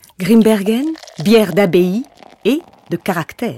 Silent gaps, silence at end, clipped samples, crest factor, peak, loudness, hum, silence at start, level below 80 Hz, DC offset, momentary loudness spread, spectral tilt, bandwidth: none; 0 s; under 0.1%; 14 dB; 0 dBFS; -15 LUFS; none; 0.2 s; -54 dBFS; under 0.1%; 12 LU; -6 dB/octave; 16.5 kHz